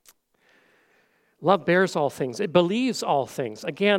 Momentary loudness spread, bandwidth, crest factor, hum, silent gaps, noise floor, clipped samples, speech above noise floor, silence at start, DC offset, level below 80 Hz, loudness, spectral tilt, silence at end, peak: 9 LU; 16.5 kHz; 20 dB; none; none; -64 dBFS; under 0.1%; 42 dB; 1.4 s; under 0.1%; -72 dBFS; -24 LUFS; -5 dB/octave; 0 s; -4 dBFS